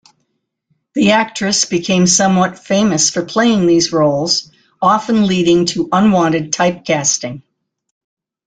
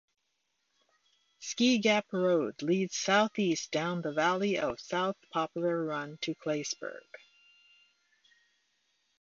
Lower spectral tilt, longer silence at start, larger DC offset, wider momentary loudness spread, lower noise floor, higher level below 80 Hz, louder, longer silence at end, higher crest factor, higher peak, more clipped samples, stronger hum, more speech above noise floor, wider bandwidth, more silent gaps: about the same, -4 dB/octave vs -4 dB/octave; second, 0.95 s vs 1.4 s; neither; second, 5 LU vs 10 LU; second, -69 dBFS vs -80 dBFS; first, -52 dBFS vs -74 dBFS; first, -13 LUFS vs -31 LUFS; second, 1.05 s vs 2.2 s; second, 14 dB vs 20 dB; first, 0 dBFS vs -12 dBFS; neither; neither; first, 56 dB vs 49 dB; first, 9.6 kHz vs 7.6 kHz; neither